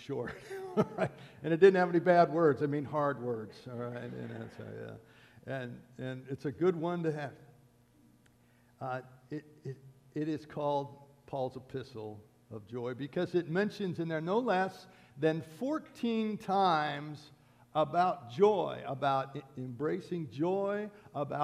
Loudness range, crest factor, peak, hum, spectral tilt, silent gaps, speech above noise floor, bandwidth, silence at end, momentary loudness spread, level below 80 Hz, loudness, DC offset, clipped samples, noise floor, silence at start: 11 LU; 24 dB; -10 dBFS; none; -7.5 dB/octave; none; 32 dB; 13 kHz; 0 s; 17 LU; -74 dBFS; -33 LUFS; under 0.1%; under 0.1%; -65 dBFS; 0 s